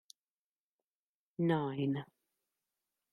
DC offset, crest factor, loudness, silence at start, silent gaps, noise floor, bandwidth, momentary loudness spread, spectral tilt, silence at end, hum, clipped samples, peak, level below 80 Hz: under 0.1%; 20 dB; -36 LUFS; 1.4 s; none; under -90 dBFS; 11.5 kHz; 18 LU; -8 dB/octave; 1.1 s; none; under 0.1%; -22 dBFS; -80 dBFS